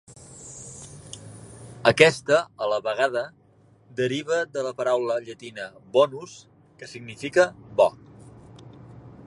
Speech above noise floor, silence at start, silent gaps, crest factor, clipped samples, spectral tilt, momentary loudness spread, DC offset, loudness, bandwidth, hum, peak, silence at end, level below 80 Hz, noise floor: 33 dB; 0.1 s; none; 26 dB; under 0.1%; -4 dB/octave; 21 LU; under 0.1%; -23 LUFS; 11.5 kHz; none; 0 dBFS; 0 s; -62 dBFS; -57 dBFS